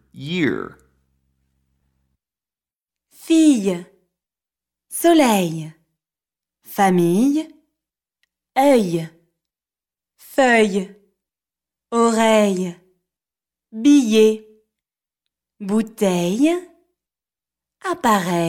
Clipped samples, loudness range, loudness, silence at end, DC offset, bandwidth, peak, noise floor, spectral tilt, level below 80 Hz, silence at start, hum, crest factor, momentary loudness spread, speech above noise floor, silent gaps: under 0.1%; 4 LU; -18 LUFS; 0 s; under 0.1%; 17.5 kHz; -4 dBFS; under -90 dBFS; -5 dB/octave; -62 dBFS; 0.15 s; none; 18 dB; 16 LU; over 73 dB; none